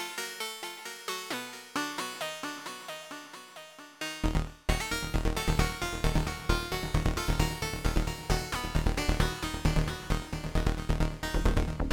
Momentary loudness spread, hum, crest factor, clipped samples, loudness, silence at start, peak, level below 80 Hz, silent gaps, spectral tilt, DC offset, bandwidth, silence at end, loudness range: 10 LU; none; 18 dB; under 0.1%; -32 LUFS; 0 s; -12 dBFS; -34 dBFS; none; -4.5 dB/octave; under 0.1%; 18 kHz; 0 s; 6 LU